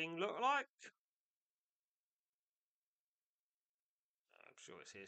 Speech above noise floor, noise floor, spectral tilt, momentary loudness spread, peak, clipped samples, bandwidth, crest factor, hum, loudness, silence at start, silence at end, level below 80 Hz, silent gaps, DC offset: over 47 dB; under -90 dBFS; -3.5 dB/octave; 23 LU; -26 dBFS; under 0.1%; 8.8 kHz; 22 dB; none; -39 LUFS; 0 s; 0 s; under -90 dBFS; 0.69-0.78 s, 0.98-4.25 s; under 0.1%